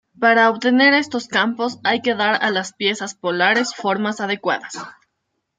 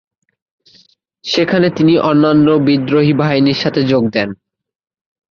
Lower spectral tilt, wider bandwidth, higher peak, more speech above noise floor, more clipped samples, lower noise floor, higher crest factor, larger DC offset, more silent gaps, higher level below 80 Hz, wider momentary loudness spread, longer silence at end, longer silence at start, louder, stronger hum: second, -3.5 dB/octave vs -7 dB/octave; first, 9.4 kHz vs 7 kHz; about the same, -2 dBFS vs -2 dBFS; first, 56 dB vs 39 dB; neither; first, -74 dBFS vs -51 dBFS; first, 18 dB vs 12 dB; neither; neither; second, -70 dBFS vs -52 dBFS; first, 10 LU vs 7 LU; second, 0.65 s vs 1 s; second, 0.2 s vs 1.25 s; second, -18 LUFS vs -13 LUFS; neither